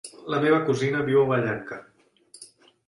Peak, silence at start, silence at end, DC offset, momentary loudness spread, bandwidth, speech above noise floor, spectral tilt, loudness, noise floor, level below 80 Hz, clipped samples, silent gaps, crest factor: -10 dBFS; 0.05 s; 0.4 s; under 0.1%; 14 LU; 11.5 kHz; 32 dB; -6.5 dB/octave; -23 LUFS; -55 dBFS; -64 dBFS; under 0.1%; none; 16 dB